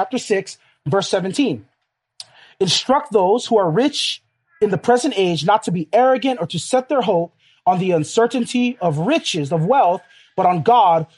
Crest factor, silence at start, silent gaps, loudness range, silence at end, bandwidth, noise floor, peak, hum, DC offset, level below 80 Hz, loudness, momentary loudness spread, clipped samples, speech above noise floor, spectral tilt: 16 dB; 0 s; none; 2 LU; 0.1 s; 11.5 kHz; -69 dBFS; -2 dBFS; none; under 0.1%; -64 dBFS; -18 LUFS; 7 LU; under 0.1%; 52 dB; -5 dB/octave